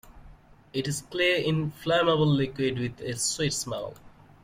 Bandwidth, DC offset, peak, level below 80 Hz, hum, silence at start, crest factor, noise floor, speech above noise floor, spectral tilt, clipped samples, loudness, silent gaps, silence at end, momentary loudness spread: 16.5 kHz; under 0.1%; -12 dBFS; -54 dBFS; none; 0.05 s; 16 dB; -52 dBFS; 25 dB; -4.5 dB/octave; under 0.1%; -27 LUFS; none; 0.35 s; 10 LU